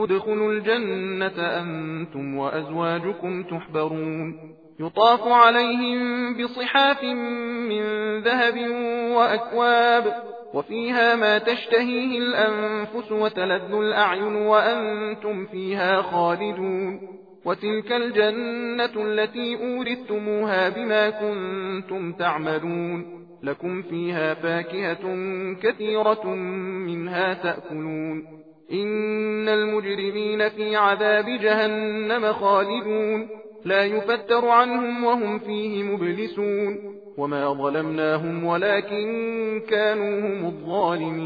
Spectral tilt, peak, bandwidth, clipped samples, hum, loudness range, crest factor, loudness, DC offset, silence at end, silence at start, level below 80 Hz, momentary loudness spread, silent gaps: -7 dB/octave; -2 dBFS; 5 kHz; under 0.1%; none; 6 LU; 20 dB; -23 LUFS; under 0.1%; 0 s; 0 s; -74 dBFS; 11 LU; none